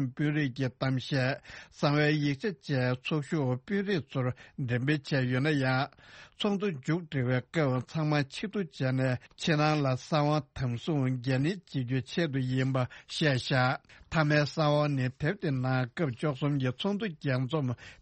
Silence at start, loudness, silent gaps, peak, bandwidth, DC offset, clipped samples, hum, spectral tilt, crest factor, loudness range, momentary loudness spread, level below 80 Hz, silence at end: 0 s; -30 LUFS; none; -12 dBFS; 8.4 kHz; under 0.1%; under 0.1%; none; -7 dB/octave; 18 dB; 2 LU; 7 LU; -62 dBFS; 0.1 s